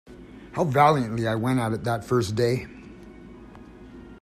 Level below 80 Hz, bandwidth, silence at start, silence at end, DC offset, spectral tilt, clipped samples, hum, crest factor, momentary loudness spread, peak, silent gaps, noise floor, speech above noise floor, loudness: -52 dBFS; 15 kHz; 0.05 s; 0.05 s; under 0.1%; -6.5 dB/octave; under 0.1%; none; 20 dB; 26 LU; -6 dBFS; none; -45 dBFS; 22 dB; -24 LUFS